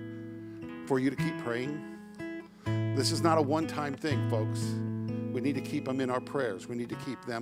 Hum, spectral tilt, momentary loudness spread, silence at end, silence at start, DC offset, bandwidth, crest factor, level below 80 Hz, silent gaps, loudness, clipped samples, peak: none; -6 dB/octave; 15 LU; 0 s; 0 s; under 0.1%; 15.5 kHz; 22 dB; -66 dBFS; none; -32 LUFS; under 0.1%; -10 dBFS